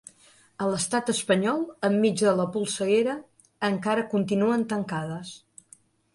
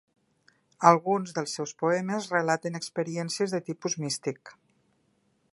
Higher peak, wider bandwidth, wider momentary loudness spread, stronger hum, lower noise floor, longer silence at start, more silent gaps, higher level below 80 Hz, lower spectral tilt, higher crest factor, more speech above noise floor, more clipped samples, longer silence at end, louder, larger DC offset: second, -10 dBFS vs -2 dBFS; about the same, 11.5 kHz vs 11.5 kHz; about the same, 9 LU vs 11 LU; neither; second, -58 dBFS vs -70 dBFS; second, 0.6 s vs 0.8 s; neither; first, -68 dBFS vs -78 dBFS; about the same, -5 dB/octave vs -4.5 dB/octave; second, 18 dB vs 26 dB; second, 33 dB vs 43 dB; neither; second, 0.8 s vs 1.05 s; about the same, -26 LUFS vs -28 LUFS; neither